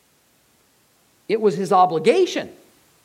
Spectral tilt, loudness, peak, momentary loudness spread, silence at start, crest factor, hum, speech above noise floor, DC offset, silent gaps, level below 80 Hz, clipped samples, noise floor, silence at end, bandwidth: -5 dB/octave; -19 LUFS; -4 dBFS; 11 LU; 1.3 s; 18 dB; none; 42 dB; under 0.1%; none; -74 dBFS; under 0.1%; -60 dBFS; 0.55 s; 14.5 kHz